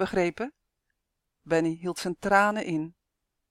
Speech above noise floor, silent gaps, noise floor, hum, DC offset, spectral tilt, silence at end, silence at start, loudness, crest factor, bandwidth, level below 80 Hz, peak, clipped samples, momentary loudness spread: 55 dB; none; -82 dBFS; none; under 0.1%; -5.5 dB/octave; 0.6 s; 0 s; -27 LUFS; 22 dB; 15 kHz; -60 dBFS; -8 dBFS; under 0.1%; 14 LU